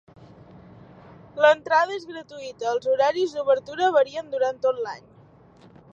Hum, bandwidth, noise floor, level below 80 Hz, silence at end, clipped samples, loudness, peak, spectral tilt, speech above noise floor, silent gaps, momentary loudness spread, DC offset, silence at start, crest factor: none; 7.8 kHz; -52 dBFS; -66 dBFS; 0.95 s; under 0.1%; -23 LUFS; -4 dBFS; -4 dB/octave; 30 dB; none; 18 LU; under 0.1%; 1.35 s; 20 dB